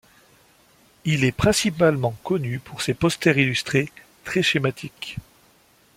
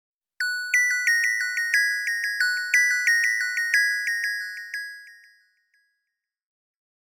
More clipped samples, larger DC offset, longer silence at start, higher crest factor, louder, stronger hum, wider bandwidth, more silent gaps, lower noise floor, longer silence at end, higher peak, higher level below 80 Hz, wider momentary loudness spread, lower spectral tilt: neither; neither; first, 1.05 s vs 0.4 s; about the same, 20 dB vs 18 dB; about the same, -22 LUFS vs -22 LUFS; neither; second, 16.5 kHz vs over 20 kHz; neither; second, -57 dBFS vs -83 dBFS; second, 0.75 s vs 2.05 s; first, -2 dBFS vs -8 dBFS; first, -50 dBFS vs under -90 dBFS; first, 15 LU vs 12 LU; first, -5 dB/octave vs 11 dB/octave